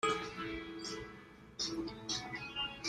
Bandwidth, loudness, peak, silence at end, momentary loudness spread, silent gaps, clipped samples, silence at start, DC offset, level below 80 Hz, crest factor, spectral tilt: 14 kHz; -40 LUFS; -22 dBFS; 0 s; 11 LU; none; under 0.1%; 0 s; under 0.1%; -62 dBFS; 20 dB; -2.5 dB/octave